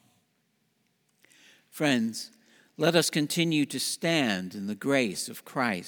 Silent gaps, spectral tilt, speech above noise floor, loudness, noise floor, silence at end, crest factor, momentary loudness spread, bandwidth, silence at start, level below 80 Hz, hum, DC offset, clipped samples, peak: none; -4 dB/octave; 45 dB; -27 LUFS; -73 dBFS; 0 s; 22 dB; 11 LU; over 20 kHz; 1.75 s; -78 dBFS; none; under 0.1%; under 0.1%; -8 dBFS